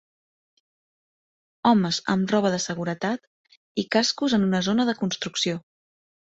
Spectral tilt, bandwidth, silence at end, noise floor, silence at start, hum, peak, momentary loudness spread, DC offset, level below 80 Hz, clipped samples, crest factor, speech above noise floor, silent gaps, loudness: -4.5 dB/octave; 8.2 kHz; 0.8 s; under -90 dBFS; 1.65 s; none; -6 dBFS; 8 LU; under 0.1%; -64 dBFS; under 0.1%; 20 dB; over 67 dB; 3.27-3.44 s, 3.57-3.75 s; -24 LUFS